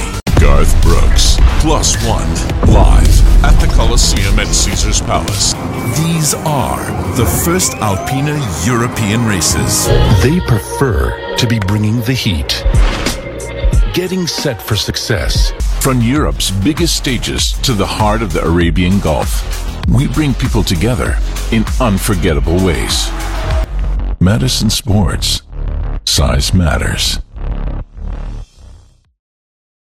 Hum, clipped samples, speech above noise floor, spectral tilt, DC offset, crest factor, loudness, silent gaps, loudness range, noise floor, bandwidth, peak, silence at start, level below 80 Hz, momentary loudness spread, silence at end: none; under 0.1%; 29 dB; -4.5 dB/octave; under 0.1%; 12 dB; -13 LUFS; none; 4 LU; -40 dBFS; 16.5 kHz; 0 dBFS; 0 s; -16 dBFS; 8 LU; 1.15 s